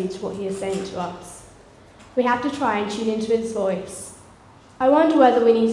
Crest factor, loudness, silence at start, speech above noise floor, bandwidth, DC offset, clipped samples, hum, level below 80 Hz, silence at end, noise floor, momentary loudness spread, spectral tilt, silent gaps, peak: 20 dB; -21 LUFS; 0 s; 28 dB; 12 kHz; under 0.1%; under 0.1%; none; -56 dBFS; 0 s; -48 dBFS; 20 LU; -5.5 dB/octave; none; -2 dBFS